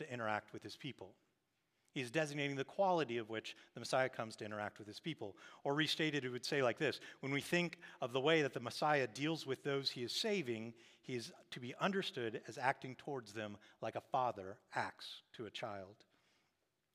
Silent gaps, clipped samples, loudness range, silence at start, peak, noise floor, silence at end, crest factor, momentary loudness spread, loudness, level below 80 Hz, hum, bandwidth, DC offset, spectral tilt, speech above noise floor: none; under 0.1%; 6 LU; 0 s; -18 dBFS; -84 dBFS; 1 s; 22 dB; 14 LU; -41 LUFS; under -90 dBFS; none; 15.5 kHz; under 0.1%; -4.5 dB/octave; 43 dB